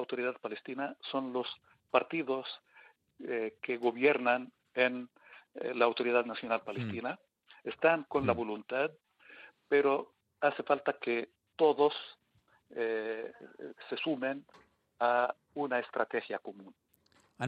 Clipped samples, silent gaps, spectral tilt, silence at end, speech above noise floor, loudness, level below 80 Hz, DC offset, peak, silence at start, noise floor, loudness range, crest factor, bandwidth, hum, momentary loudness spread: under 0.1%; none; -6.5 dB/octave; 0 s; 38 dB; -33 LUFS; -78 dBFS; under 0.1%; -12 dBFS; 0 s; -71 dBFS; 4 LU; 22 dB; 5.2 kHz; none; 18 LU